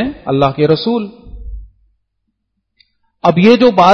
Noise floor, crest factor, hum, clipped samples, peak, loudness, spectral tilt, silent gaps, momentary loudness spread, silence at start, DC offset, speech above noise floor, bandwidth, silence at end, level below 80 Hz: -69 dBFS; 14 dB; none; 0.2%; 0 dBFS; -12 LUFS; -7 dB/octave; none; 24 LU; 0 s; under 0.1%; 59 dB; 6.6 kHz; 0 s; -36 dBFS